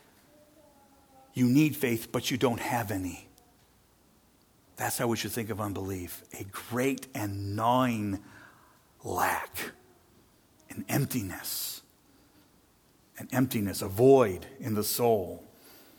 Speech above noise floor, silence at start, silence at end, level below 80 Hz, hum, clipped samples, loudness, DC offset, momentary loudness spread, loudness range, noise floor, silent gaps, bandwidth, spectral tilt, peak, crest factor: 35 dB; 1.35 s; 0.55 s; -64 dBFS; none; under 0.1%; -29 LUFS; under 0.1%; 16 LU; 8 LU; -64 dBFS; none; over 20 kHz; -5 dB/octave; -10 dBFS; 22 dB